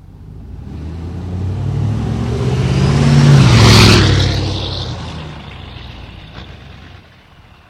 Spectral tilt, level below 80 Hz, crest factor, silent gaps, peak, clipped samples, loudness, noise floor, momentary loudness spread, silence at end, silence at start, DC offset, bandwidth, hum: -5.5 dB/octave; -26 dBFS; 14 dB; none; 0 dBFS; under 0.1%; -12 LUFS; -43 dBFS; 26 LU; 0.85 s; 0.15 s; under 0.1%; 14.5 kHz; none